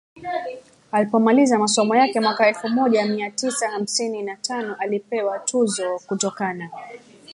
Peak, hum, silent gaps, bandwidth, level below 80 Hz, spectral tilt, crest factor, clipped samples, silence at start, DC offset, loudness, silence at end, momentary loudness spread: -4 dBFS; none; none; 11.5 kHz; -72 dBFS; -3.5 dB/octave; 18 dB; under 0.1%; 0.15 s; under 0.1%; -21 LUFS; 0 s; 12 LU